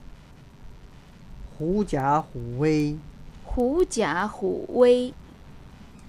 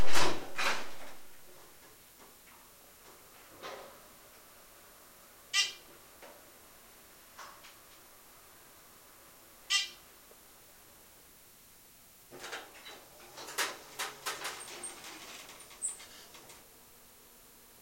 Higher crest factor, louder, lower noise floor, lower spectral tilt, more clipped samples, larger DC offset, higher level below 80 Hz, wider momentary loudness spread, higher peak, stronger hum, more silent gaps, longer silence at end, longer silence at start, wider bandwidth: about the same, 20 dB vs 22 dB; first, -24 LUFS vs -37 LUFS; second, -48 dBFS vs -58 dBFS; first, -6 dB/octave vs -1 dB/octave; neither; neither; first, -42 dBFS vs -68 dBFS; second, 19 LU vs 23 LU; first, -6 dBFS vs -10 dBFS; neither; neither; second, 0 s vs 1.85 s; about the same, 0 s vs 0 s; second, 12.5 kHz vs 16.5 kHz